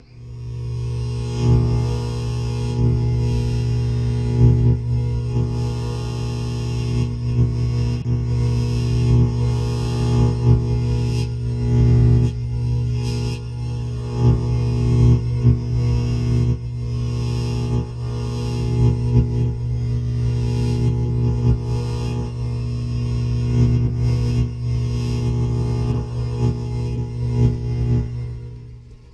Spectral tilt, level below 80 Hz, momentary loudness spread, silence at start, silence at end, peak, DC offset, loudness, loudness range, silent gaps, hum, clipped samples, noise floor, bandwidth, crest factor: -8 dB/octave; -28 dBFS; 8 LU; 0.15 s; 0.2 s; -2 dBFS; under 0.1%; -21 LUFS; 3 LU; none; none; under 0.1%; -39 dBFS; 8.8 kHz; 16 dB